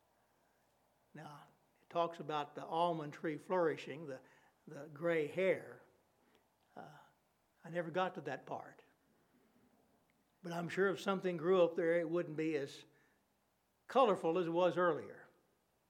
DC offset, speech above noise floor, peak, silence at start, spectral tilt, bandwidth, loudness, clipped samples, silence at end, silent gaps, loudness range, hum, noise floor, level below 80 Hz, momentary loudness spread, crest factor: under 0.1%; 42 dB; -18 dBFS; 1.15 s; -6.5 dB/octave; 13.5 kHz; -38 LUFS; under 0.1%; 0.65 s; none; 9 LU; none; -79 dBFS; under -90 dBFS; 22 LU; 22 dB